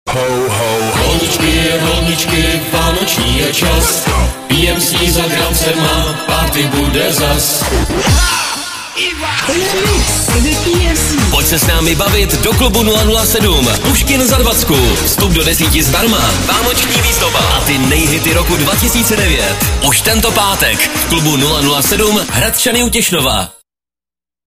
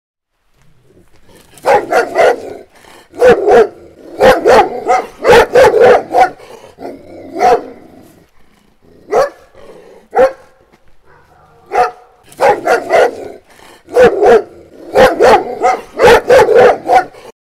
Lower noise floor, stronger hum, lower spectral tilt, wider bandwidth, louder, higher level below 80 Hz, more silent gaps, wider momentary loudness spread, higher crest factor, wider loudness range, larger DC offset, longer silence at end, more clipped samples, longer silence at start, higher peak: first, under -90 dBFS vs -54 dBFS; neither; about the same, -3 dB/octave vs -4 dB/octave; about the same, 16 kHz vs 15.5 kHz; about the same, -11 LUFS vs -10 LUFS; first, -20 dBFS vs -40 dBFS; neither; second, 4 LU vs 12 LU; about the same, 12 dB vs 10 dB; second, 2 LU vs 10 LU; neither; first, 1 s vs 0.5 s; neither; second, 0.05 s vs 1.65 s; about the same, 0 dBFS vs 0 dBFS